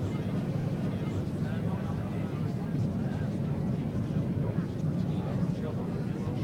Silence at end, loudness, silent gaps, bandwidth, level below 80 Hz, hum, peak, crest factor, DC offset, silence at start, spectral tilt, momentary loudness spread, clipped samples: 0 s; -32 LUFS; none; 13 kHz; -50 dBFS; none; -18 dBFS; 14 dB; under 0.1%; 0 s; -9 dB/octave; 2 LU; under 0.1%